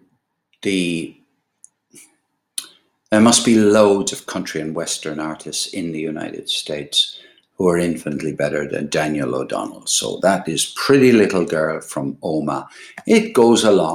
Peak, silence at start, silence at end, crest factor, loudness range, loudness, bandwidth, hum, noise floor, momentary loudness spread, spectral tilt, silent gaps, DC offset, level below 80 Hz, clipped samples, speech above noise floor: 0 dBFS; 0.65 s; 0 s; 18 dB; 5 LU; -18 LUFS; 16 kHz; none; -66 dBFS; 14 LU; -4 dB/octave; none; under 0.1%; -58 dBFS; under 0.1%; 48 dB